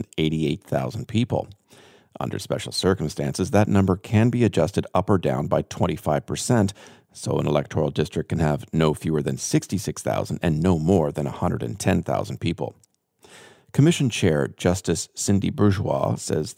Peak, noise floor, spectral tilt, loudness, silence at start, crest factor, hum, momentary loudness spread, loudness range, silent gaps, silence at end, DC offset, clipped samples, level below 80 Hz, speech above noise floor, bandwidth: -4 dBFS; -57 dBFS; -6 dB/octave; -23 LUFS; 0 s; 20 dB; none; 7 LU; 3 LU; none; 0.05 s; under 0.1%; under 0.1%; -48 dBFS; 34 dB; 16.5 kHz